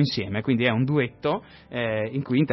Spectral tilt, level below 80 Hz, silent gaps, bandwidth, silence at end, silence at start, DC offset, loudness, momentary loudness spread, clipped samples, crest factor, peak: -8 dB/octave; -58 dBFS; none; 6 kHz; 0 s; 0 s; under 0.1%; -25 LUFS; 8 LU; under 0.1%; 16 dB; -8 dBFS